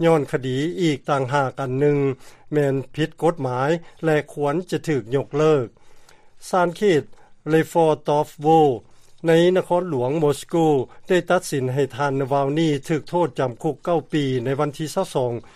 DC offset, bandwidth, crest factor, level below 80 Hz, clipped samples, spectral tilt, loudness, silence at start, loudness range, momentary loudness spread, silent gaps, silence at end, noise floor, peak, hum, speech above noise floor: under 0.1%; 14.5 kHz; 16 dB; -54 dBFS; under 0.1%; -6.5 dB/octave; -21 LUFS; 0 s; 3 LU; 6 LU; none; 0.05 s; -45 dBFS; -4 dBFS; none; 25 dB